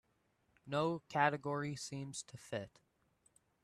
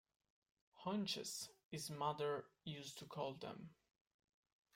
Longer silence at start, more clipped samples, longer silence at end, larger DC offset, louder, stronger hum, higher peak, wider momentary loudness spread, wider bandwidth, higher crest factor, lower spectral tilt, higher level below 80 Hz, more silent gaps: about the same, 0.65 s vs 0.75 s; neither; about the same, 0.95 s vs 1 s; neither; first, -39 LUFS vs -47 LUFS; neither; first, -18 dBFS vs -28 dBFS; about the same, 12 LU vs 10 LU; second, 13 kHz vs 16 kHz; about the same, 24 dB vs 22 dB; about the same, -5 dB/octave vs -4 dB/octave; first, -78 dBFS vs -84 dBFS; second, none vs 1.65-1.71 s